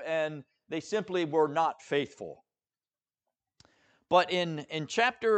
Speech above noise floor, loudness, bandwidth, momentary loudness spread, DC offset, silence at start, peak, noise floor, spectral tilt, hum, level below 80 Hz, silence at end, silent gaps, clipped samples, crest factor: over 61 dB; -30 LUFS; 8.8 kHz; 13 LU; under 0.1%; 0 s; -10 dBFS; under -90 dBFS; -4.5 dB/octave; none; -76 dBFS; 0 s; none; under 0.1%; 22 dB